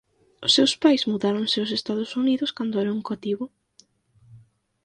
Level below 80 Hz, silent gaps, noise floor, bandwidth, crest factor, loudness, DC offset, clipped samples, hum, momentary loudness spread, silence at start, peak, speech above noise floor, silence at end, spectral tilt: -68 dBFS; none; -60 dBFS; 10.5 kHz; 18 dB; -23 LUFS; under 0.1%; under 0.1%; none; 11 LU; 0.4 s; -6 dBFS; 37 dB; 0.45 s; -4 dB/octave